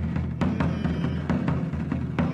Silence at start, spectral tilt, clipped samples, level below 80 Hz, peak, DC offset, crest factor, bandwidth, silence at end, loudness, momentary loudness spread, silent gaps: 0 s; -8.5 dB/octave; under 0.1%; -38 dBFS; -12 dBFS; under 0.1%; 14 dB; 8 kHz; 0 s; -27 LUFS; 3 LU; none